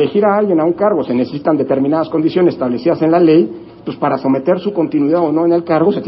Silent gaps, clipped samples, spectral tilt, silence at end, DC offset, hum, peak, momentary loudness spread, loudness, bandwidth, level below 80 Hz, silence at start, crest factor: none; under 0.1%; -12.5 dB/octave; 0 s; under 0.1%; none; 0 dBFS; 6 LU; -14 LUFS; 5.8 kHz; -54 dBFS; 0 s; 12 dB